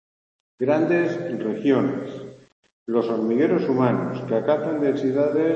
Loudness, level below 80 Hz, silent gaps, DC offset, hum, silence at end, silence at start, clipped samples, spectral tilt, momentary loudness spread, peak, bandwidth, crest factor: -22 LUFS; -68 dBFS; 2.52-2.63 s, 2.72-2.86 s; under 0.1%; none; 0 s; 0.6 s; under 0.1%; -8.5 dB/octave; 9 LU; -6 dBFS; 7.8 kHz; 16 dB